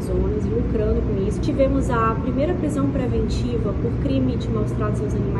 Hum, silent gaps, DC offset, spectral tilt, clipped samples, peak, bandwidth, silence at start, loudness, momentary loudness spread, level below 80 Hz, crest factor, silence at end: none; none; under 0.1%; -8 dB/octave; under 0.1%; -6 dBFS; 11.5 kHz; 0 s; -22 LUFS; 3 LU; -28 dBFS; 14 dB; 0 s